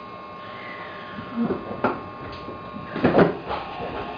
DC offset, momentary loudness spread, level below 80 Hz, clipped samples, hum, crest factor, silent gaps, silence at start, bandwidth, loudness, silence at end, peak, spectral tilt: under 0.1%; 16 LU; -52 dBFS; under 0.1%; none; 24 dB; none; 0 s; 5.2 kHz; -26 LUFS; 0 s; -4 dBFS; -8.5 dB/octave